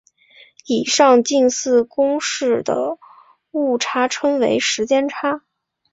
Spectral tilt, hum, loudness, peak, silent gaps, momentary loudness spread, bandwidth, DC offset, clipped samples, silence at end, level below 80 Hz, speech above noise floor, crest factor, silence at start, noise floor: -2.5 dB/octave; none; -18 LUFS; -2 dBFS; none; 10 LU; 8 kHz; under 0.1%; under 0.1%; 0.55 s; -64 dBFS; 33 dB; 16 dB; 0.7 s; -50 dBFS